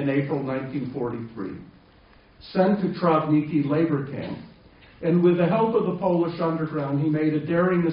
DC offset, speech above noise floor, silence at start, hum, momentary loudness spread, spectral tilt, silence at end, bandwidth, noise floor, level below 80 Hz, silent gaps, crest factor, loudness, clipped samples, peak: under 0.1%; 31 dB; 0 s; none; 13 LU; -7.5 dB/octave; 0 s; 5.4 kHz; -54 dBFS; -58 dBFS; none; 18 dB; -24 LUFS; under 0.1%; -6 dBFS